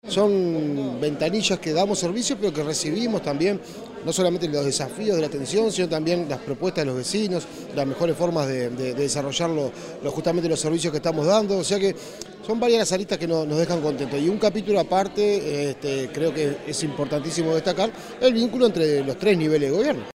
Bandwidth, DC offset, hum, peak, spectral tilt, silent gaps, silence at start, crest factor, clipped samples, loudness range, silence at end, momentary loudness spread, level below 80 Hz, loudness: 16 kHz; under 0.1%; none; -6 dBFS; -4.5 dB/octave; none; 0.05 s; 16 dB; under 0.1%; 2 LU; 0.05 s; 7 LU; -56 dBFS; -23 LUFS